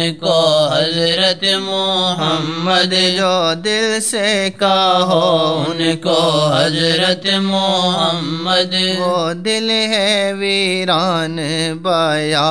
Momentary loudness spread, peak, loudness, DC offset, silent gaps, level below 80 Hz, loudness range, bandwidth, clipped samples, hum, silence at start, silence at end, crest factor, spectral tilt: 4 LU; 0 dBFS; -14 LUFS; 0.5%; none; -62 dBFS; 1 LU; 11 kHz; under 0.1%; none; 0 s; 0 s; 14 dB; -4 dB/octave